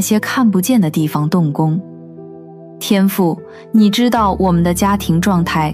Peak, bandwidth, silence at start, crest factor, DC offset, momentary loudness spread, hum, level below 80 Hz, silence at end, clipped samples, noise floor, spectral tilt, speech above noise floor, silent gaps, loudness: -2 dBFS; 16 kHz; 0 s; 14 dB; under 0.1%; 14 LU; none; -36 dBFS; 0 s; under 0.1%; -35 dBFS; -6 dB/octave; 21 dB; none; -14 LUFS